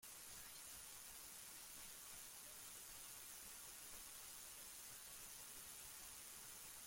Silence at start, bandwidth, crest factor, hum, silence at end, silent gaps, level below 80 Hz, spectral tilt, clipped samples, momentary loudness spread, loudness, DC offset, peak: 0 s; 16.5 kHz; 16 dB; none; 0 s; none; -76 dBFS; 0 dB/octave; under 0.1%; 1 LU; -54 LUFS; under 0.1%; -42 dBFS